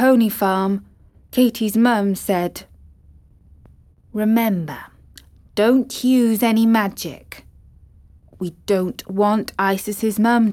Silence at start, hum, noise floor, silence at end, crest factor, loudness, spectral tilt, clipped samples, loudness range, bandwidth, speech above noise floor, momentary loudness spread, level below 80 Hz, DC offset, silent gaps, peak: 0 s; none; -49 dBFS; 0 s; 16 dB; -19 LUFS; -5.5 dB/octave; under 0.1%; 5 LU; 17 kHz; 31 dB; 14 LU; -52 dBFS; under 0.1%; none; -4 dBFS